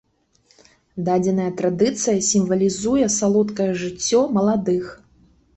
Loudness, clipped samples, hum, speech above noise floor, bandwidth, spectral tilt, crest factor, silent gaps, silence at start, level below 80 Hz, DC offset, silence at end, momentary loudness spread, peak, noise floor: -20 LUFS; under 0.1%; none; 41 dB; 8.4 kHz; -5 dB/octave; 14 dB; none; 0.95 s; -54 dBFS; under 0.1%; 0.65 s; 6 LU; -6 dBFS; -61 dBFS